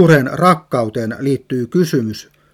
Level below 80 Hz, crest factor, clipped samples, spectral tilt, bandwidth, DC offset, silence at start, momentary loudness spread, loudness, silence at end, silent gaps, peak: -54 dBFS; 16 dB; under 0.1%; -7 dB/octave; 15.5 kHz; under 0.1%; 0 s; 9 LU; -16 LUFS; 0.35 s; none; 0 dBFS